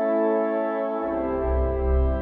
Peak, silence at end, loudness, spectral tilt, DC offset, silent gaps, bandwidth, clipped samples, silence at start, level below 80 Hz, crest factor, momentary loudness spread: -12 dBFS; 0 s; -25 LUFS; -11.5 dB/octave; under 0.1%; none; 3.7 kHz; under 0.1%; 0 s; -28 dBFS; 10 dB; 4 LU